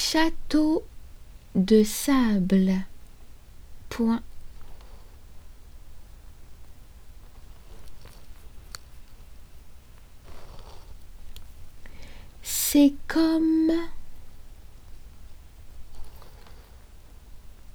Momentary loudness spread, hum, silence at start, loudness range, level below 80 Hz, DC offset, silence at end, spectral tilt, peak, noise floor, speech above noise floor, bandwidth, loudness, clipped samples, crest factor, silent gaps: 28 LU; none; 0 s; 24 LU; -42 dBFS; under 0.1%; 0.05 s; -5 dB/octave; -8 dBFS; -47 dBFS; 25 dB; over 20 kHz; -23 LUFS; under 0.1%; 20 dB; none